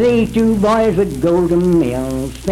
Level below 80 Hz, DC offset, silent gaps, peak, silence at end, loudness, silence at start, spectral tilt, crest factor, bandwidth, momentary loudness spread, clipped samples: -32 dBFS; under 0.1%; none; -2 dBFS; 0 s; -15 LUFS; 0 s; -7 dB/octave; 12 dB; 15.5 kHz; 7 LU; under 0.1%